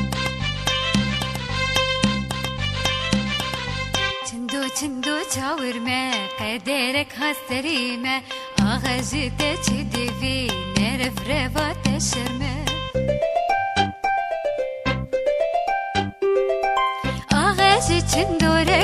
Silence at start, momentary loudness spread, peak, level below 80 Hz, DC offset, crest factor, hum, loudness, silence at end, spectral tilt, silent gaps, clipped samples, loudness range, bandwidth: 0 s; 6 LU; -2 dBFS; -36 dBFS; under 0.1%; 20 dB; none; -22 LUFS; 0 s; -4 dB/octave; none; under 0.1%; 3 LU; 15 kHz